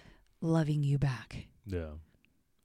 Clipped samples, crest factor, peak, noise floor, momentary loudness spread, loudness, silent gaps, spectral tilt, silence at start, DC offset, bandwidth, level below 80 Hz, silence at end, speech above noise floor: under 0.1%; 18 dB; -16 dBFS; -70 dBFS; 17 LU; -33 LUFS; none; -8 dB/octave; 0.4 s; under 0.1%; 10.5 kHz; -52 dBFS; 0.65 s; 38 dB